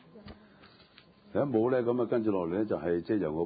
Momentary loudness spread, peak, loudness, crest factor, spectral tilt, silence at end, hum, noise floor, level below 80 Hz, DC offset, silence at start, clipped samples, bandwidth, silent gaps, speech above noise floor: 8 LU; -16 dBFS; -30 LUFS; 16 dB; -11.5 dB/octave; 0 s; none; -59 dBFS; -60 dBFS; under 0.1%; 0.15 s; under 0.1%; 5 kHz; none; 30 dB